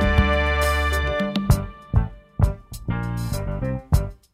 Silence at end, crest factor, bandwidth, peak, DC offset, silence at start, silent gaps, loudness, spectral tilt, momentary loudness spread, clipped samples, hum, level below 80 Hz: 0.2 s; 20 dB; 16 kHz; -2 dBFS; under 0.1%; 0 s; none; -23 LUFS; -6 dB/octave; 8 LU; under 0.1%; none; -26 dBFS